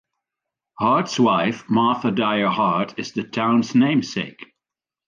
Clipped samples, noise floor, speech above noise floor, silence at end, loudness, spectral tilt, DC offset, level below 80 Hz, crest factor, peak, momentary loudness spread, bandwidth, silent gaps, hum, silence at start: under 0.1%; -88 dBFS; 68 dB; 0.65 s; -20 LUFS; -5.5 dB/octave; under 0.1%; -64 dBFS; 16 dB; -6 dBFS; 9 LU; 7.4 kHz; none; none; 0.8 s